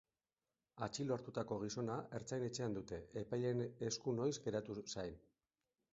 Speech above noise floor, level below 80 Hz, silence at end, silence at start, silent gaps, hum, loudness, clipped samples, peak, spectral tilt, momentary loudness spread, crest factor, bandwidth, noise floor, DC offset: over 47 dB; -72 dBFS; 0.75 s; 0.75 s; none; none; -44 LUFS; under 0.1%; -26 dBFS; -6 dB/octave; 7 LU; 18 dB; 7.6 kHz; under -90 dBFS; under 0.1%